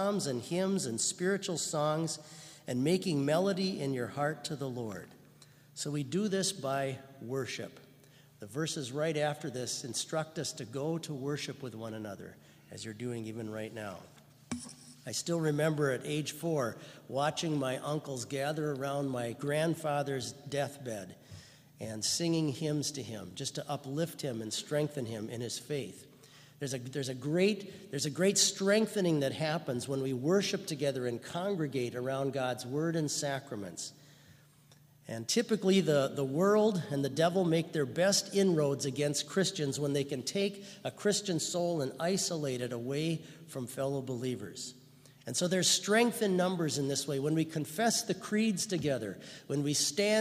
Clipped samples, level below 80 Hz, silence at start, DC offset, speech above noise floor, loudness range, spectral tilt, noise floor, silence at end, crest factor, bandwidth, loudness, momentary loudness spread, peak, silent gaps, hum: under 0.1%; -76 dBFS; 0 s; under 0.1%; 28 dB; 7 LU; -4 dB/octave; -61 dBFS; 0 s; 22 dB; 15.5 kHz; -33 LUFS; 14 LU; -12 dBFS; none; none